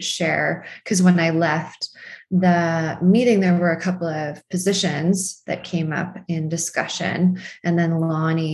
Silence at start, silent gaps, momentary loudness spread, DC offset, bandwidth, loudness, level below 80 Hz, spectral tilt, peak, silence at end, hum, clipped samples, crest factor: 0 s; none; 10 LU; under 0.1%; 12.5 kHz; -21 LUFS; -62 dBFS; -5.5 dB/octave; -4 dBFS; 0 s; none; under 0.1%; 16 dB